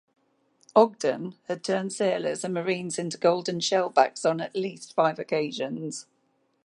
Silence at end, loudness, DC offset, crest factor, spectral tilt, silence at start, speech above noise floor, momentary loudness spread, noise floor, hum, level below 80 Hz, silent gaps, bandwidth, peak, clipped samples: 0.65 s; -26 LUFS; under 0.1%; 22 dB; -4.5 dB/octave; 0.75 s; 44 dB; 11 LU; -70 dBFS; none; -78 dBFS; none; 11.5 kHz; -4 dBFS; under 0.1%